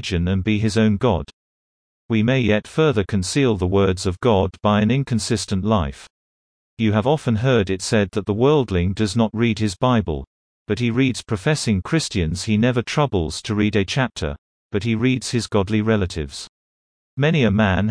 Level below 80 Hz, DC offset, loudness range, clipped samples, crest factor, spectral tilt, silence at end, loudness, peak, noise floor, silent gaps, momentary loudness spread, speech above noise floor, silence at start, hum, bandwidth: -40 dBFS; under 0.1%; 2 LU; under 0.1%; 16 dB; -6 dB/octave; 0 s; -20 LUFS; -4 dBFS; under -90 dBFS; 1.33-2.09 s, 6.10-6.77 s, 10.27-10.66 s, 14.38-14.70 s, 16.49-17.17 s; 8 LU; over 71 dB; 0 s; none; 10.5 kHz